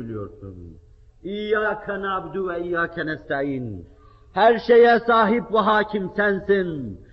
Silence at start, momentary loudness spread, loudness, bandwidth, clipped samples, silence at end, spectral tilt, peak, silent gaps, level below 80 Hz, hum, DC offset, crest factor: 0 s; 19 LU; -21 LUFS; 5.8 kHz; under 0.1%; 0.15 s; -3.5 dB/octave; -6 dBFS; none; -50 dBFS; none; under 0.1%; 16 dB